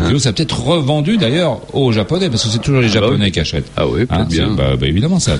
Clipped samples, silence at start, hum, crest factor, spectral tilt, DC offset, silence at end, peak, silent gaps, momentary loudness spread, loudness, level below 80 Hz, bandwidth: under 0.1%; 0 s; none; 12 dB; -5.5 dB/octave; under 0.1%; 0 s; -2 dBFS; none; 4 LU; -14 LUFS; -30 dBFS; 11.5 kHz